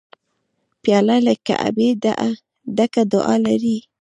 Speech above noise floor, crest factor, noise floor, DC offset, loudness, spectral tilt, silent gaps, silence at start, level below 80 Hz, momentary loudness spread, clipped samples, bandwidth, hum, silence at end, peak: 54 dB; 16 dB; -71 dBFS; under 0.1%; -18 LUFS; -6 dB/octave; none; 0.85 s; -62 dBFS; 8 LU; under 0.1%; 10.5 kHz; none; 0.25 s; -2 dBFS